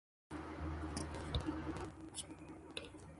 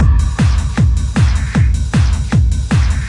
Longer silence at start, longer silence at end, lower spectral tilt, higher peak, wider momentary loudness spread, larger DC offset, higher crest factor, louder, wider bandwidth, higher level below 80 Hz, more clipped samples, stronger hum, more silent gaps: first, 0.3 s vs 0 s; about the same, 0 s vs 0 s; second, -5 dB/octave vs -6.5 dB/octave; second, -24 dBFS vs -2 dBFS; first, 9 LU vs 1 LU; neither; first, 22 dB vs 10 dB; second, -46 LUFS vs -14 LUFS; about the same, 11.5 kHz vs 11 kHz; second, -52 dBFS vs -16 dBFS; neither; neither; neither